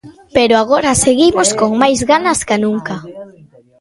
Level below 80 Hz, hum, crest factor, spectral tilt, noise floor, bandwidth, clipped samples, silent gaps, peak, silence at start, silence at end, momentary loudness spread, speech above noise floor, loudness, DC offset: -42 dBFS; none; 14 dB; -3.5 dB/octave; -44 dBFS; 11.5 kHz; under 0.1%; none; 0 dBFS; 0.05 s; 0.55 s; 11 LU; 32 dB; -12 LUFS; under 0.1%